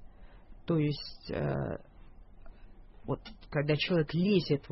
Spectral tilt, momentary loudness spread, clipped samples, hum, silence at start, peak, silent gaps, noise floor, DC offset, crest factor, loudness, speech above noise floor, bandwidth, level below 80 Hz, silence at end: -10 dB/octave; 11 LU; under 0.1%; none; 0 s; -14 dBFS; none; -52 dBFS; under 0.1%; 18 dB; -32 LUFS; 21 dB; 5.8 kHz; -52 dBFS; 0.05 s